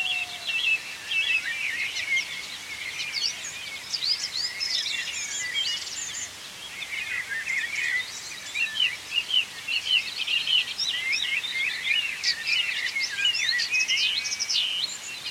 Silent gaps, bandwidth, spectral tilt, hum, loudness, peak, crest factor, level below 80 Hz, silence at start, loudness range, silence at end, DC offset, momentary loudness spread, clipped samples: none; 16.5 kHz; 2 dB/octave; none; -25 LUFS; -12 dBFS; 18 dB; -68 dBFS; 0 s; 5 LU; 0 s; under 0.1%; 10 LU; under 0.1%